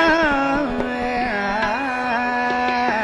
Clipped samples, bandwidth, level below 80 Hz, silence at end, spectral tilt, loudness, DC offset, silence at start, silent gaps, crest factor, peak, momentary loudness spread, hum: under 0.1%; 11 kHz; -42 dBFS; 0 s; -5 dB/octave; -20 LUFS; under 0.1%; 0 s; none; 14 dB; -6 dBFS; 5 LU; none